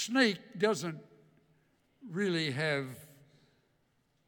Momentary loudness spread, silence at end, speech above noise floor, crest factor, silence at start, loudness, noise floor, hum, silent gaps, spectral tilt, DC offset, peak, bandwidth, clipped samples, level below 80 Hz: 16 LU; 1.2 s; 42 dB; 22 dB; 0 s; -32 LUFS; -74 dBFS; none; none; -4.5 dB/octave; under 0.1%; -12 dBFS; 19 kHz; under 0.1%; -82 dBFS